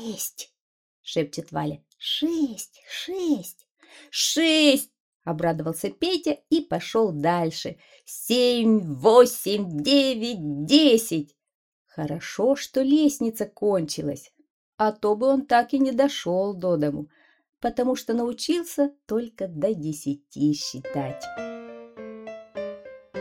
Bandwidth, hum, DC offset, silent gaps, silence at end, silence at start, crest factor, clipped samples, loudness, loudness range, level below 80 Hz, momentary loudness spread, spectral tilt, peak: 17.5 kHz; none; under 0.1%; 0.60-1.04 s, 3.71-3.75 s, 5.00-5.20 s, 11.55-11.85 s, 14.50-14.78 s, 17.49-17.53 s; 0 s; 0 s; 20 dB; under 0.1%; -24 LUFS; 8 LU; -62 dBFS; 18 LU; -4.5 dB/octave; -4 dBFS